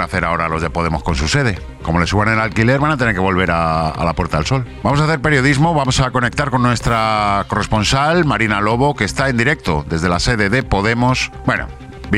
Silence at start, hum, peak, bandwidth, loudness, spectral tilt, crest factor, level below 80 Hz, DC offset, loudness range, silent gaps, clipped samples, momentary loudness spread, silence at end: 0 s; none; 0 dBFS; 13 kHz; -16 LUFS; -5.5 dB/octave; 16 dB; -30 dBFS; 0.2%; 1 LU; none; under 0.1%; 5 LU; 0 s